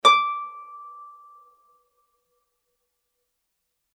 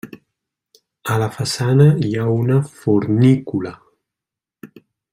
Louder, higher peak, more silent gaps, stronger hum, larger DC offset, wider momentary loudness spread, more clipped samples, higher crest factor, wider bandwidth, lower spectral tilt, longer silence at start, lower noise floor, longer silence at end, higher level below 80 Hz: second, -22 LUFS vs -17 LUFS; about the same, -4 dBFS vs -2 dBFS; neither; neither; neither; first, 25 LU vs 12 LU; neither; first, 26 dB vs 16 dB; second, 14 kHz vs 15.5 kHz; second, 1 dB/octave vs -7 dB/octave; about the same, 0.05 s vs 0.05 s; second, -78 dBFS vs -86 dBFS; first, 2.9 s vs 0.45 s; second, under -90 dBFS vs -54 dBFS